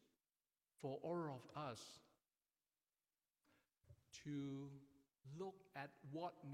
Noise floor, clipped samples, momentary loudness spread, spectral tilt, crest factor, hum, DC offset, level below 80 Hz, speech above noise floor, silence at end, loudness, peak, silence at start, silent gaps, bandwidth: under -90 dBFS; under 0.1%; 14 LU; -6 dB/octave; 18 dB; none; under 0.1%; -88 dBFS; over 39 dB; 0 s; -52 LUFS; -36 dBFS; 0.8 s; none; 15.5 kHz